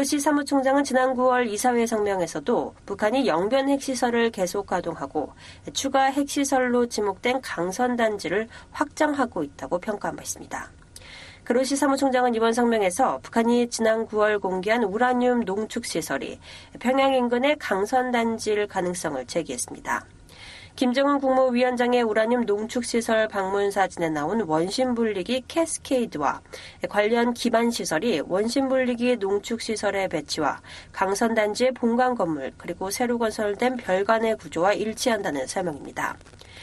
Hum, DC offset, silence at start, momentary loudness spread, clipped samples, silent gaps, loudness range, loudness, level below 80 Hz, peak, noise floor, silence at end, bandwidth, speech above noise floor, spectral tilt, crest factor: none; under 0.1%; 0 s; 9 LU; under 0.1%; none; 3 LU; -24 LUFS; -56 dBFS; -6 dBFS; -44 dBFS; 0 s; 13 kHz; 21 dB; -4 dB/octave; 18 dB